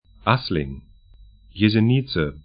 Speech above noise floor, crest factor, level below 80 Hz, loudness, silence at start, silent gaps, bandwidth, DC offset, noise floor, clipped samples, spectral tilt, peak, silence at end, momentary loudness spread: 29 dB; 22 dB; -42 dBFS; -21 LUFS; 0.25 s; none; 5.2 kHz; under 0.1%; -49 dBFS; under 0.1%; -11.5 dB/octave; -2 dBFS; 0.05 s; 18 LU